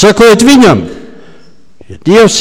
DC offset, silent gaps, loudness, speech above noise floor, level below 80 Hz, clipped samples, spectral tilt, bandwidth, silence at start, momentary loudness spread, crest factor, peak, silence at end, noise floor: 3%; none; -5 LUFS; 38 dB; -36 dBFS; 0.3%; -4.5 dB/octave; 17 kHz; 0 s; 13 LU; 6 dB; 0 dBFS; 0 s; -42 dBFS